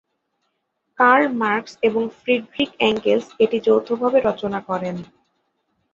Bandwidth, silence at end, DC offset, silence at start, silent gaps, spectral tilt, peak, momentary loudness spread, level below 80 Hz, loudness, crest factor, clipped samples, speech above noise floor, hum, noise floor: 7.4 kHz; 0.9 s; under 0.1%; 1 s; none; -5.5 dB/octave; -2 dBFS; 10 LU; -60 dBFS; -20 LUFS; 18 dB; under 0.1%; 54 dB; none; -73 dBFS